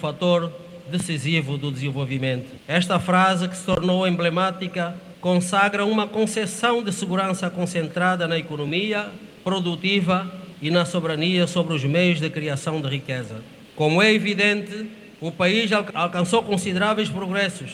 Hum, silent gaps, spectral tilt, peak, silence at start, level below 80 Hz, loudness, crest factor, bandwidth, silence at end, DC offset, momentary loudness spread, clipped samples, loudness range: none; none; -5 dB/octave; -2 dBFS; 0 s; -60 dBFS; -22 LUFS; 20 dB; 12.5 kHz; 0 s; under 0.1%; 11 LU; under 0.1%; 3 LU